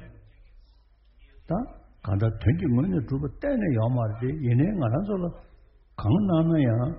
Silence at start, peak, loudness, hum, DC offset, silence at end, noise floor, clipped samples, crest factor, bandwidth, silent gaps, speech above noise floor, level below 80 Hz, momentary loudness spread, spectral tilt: 0 s; -10 dBFS; -26 LUFS; none; under 0.1%; 0 s; -58 dBFS; under 0.1%; 16 dB; 4.4 kHz; none; 33 dB; -44 dBFS; 9 LU; -9 dB/octave